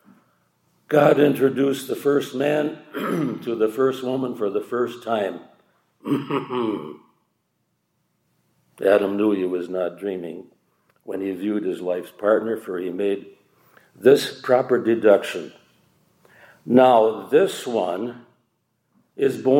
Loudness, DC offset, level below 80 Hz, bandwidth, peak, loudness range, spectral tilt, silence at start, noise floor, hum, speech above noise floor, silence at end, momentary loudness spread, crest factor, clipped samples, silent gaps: -21 LUFS; under 0.1%; -76 dBFS; 16.5 kHz; -2 dBFS; 7 LU; -6 dB/octave; 0.9 s; -72 dBFS; none; 51 dB; 0 s; 13 LU; 20 dB; under 0.1%; none